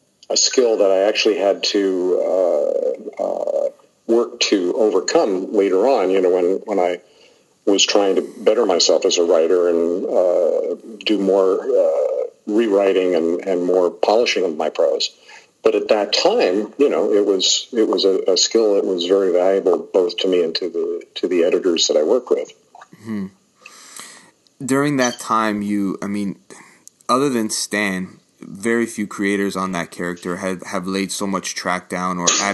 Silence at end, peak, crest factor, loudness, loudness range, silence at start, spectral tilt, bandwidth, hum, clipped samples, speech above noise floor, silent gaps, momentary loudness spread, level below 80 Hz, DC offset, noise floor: 0 s; -2 dBFS; 18 dB; -18 LUFS; 6 LU; 0.3 s; -3 dB/octave; 12.5 kHz; none; under 0.1%; 35 dB; none; 10 LU; -64 dBFS; under 0.1%; -53 dBFS